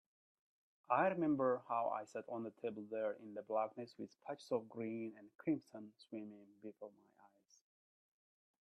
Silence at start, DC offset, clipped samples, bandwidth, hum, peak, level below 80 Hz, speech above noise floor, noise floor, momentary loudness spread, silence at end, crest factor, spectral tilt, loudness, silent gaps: 0.9 s; under 0.1%; under 0.1%; 11 kHz; none; -20 dBFS; -88 dBFS; 28 dB; -70 dBFS; 19 LU; 1.8 s; 24 dB; -7.5 dB/octave; -42 LUFS; none